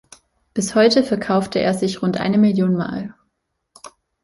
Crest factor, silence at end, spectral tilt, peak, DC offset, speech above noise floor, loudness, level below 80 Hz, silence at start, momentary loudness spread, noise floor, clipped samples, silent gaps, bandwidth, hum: 16 dB; 0.35 s; -5.5 dB/octave; -4 dBFS; under 0.1%; 56 dB; -18 LUFS; -56 dBFS; 0.55 s; 12 LU; -73 dBFS; under 0.1%; none; 11.5 kHz; none